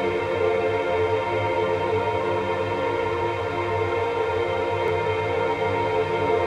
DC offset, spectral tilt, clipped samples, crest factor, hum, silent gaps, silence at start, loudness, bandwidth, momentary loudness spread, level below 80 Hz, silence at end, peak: under 0.1%; -6.5 dB/octave; under 0.1%; 12 dB; none; none; 0 s; -24 LUFS; 10 kHz; 2 LU; -54 dBFS; 0 s; -10 dBFS